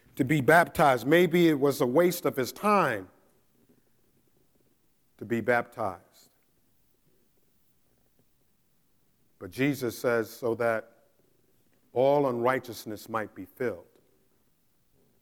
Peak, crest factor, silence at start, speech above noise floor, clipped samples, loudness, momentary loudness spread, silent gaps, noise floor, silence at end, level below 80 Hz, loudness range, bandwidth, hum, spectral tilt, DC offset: -8 dBFS; 22 dB; 0.15 s; 45 dB; under 0.1%; -26 LUFS; 15 LU; none; -71 dBFS; 1.4 s; -66 dBFS; 10 LU; 18.5 kHz; none; -6 dB/octave; under 0.1%